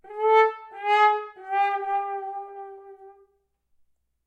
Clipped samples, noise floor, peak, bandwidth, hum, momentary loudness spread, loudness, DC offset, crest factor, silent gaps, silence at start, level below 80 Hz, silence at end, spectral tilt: under 0.1%; -69 dBFS; -8 dBFS; 8.4 kHz; none; 18 LU; -23 LUFS; under 0.1%; 18 dB; none; 0.05 s; -78 dBFS; 1.15 s; -1 dB/octave